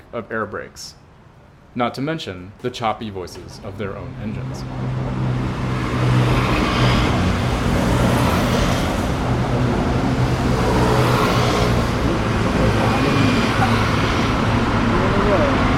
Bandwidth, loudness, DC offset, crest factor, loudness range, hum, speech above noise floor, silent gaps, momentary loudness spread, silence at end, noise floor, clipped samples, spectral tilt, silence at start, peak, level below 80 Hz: 16 kHz; -19 LUFS; under 0.1%; 14 dB; 9 LU; none; 20 dB; none; 12 LU; 0 s; -46 dBFS; under 0.1%; -6 dB/octave; 0.15 s; -4 dBFS; -28 dBFS